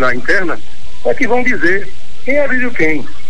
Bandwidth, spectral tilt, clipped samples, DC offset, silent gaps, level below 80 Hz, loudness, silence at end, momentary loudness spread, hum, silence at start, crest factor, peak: 10.5 kHz; -5.5 dB/octave; under 0.1%; 40%; none; -42 dBFS; -15 LUFS; 0 s; 10 LU; none; 0 s; 12 dB; 0 dBFS